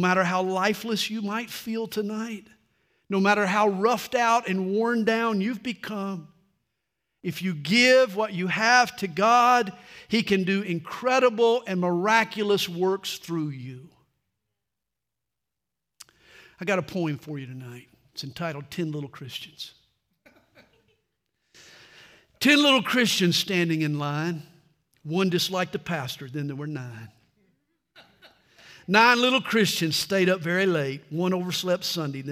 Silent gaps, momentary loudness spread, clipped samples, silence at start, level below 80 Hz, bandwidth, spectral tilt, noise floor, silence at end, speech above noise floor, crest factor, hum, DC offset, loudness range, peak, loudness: none; 17 LU; under 0.1%; 0 s; -70 dBFS; 16 kHz; -4.5 dB/octave; -86 dBFS; 0 s; 62 dB; 24 dB; none; under 0.1%; 14 LU; -2 dBFS; -24 LUFS